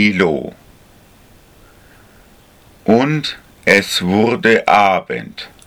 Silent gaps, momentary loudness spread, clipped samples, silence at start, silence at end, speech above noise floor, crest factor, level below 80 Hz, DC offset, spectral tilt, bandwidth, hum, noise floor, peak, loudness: none; 14 LU; under 0.1%; 0 s; 0.2 s; 32 dB; 16 dB; -50 dBFS; under 0.1%; -5 dB/octave; 19.5 kHz; none; -46 dBFS; 0 dBFS; -14 LUFS